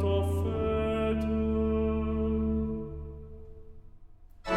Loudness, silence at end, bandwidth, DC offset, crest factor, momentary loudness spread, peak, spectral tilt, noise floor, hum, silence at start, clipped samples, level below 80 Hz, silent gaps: -30 LUFS; 0 s; 13 kHz; under 0.1%; 14 dB; 16 LU; -16 dBFS; -8.5 dB/octave; -50 dBFS; none; 0 s; under 0.1%; -38 dBFS; none